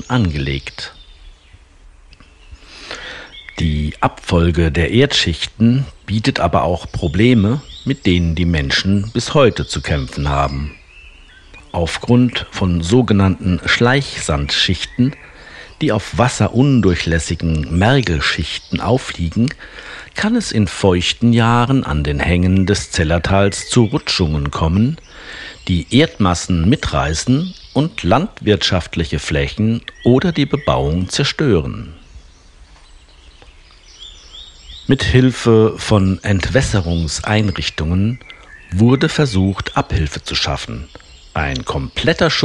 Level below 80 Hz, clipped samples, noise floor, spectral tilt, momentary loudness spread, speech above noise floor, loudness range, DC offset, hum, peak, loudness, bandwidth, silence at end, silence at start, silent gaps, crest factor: -32 dBFS; under 0.1%; -45 dBFS; -5.5 dB/octave; 15 LU; 29 dB; 5 LU; under 0.1%; none; 0 dBFS; -16 LUFS; 11 kHz; 0 s; 0 s; none; 16 dB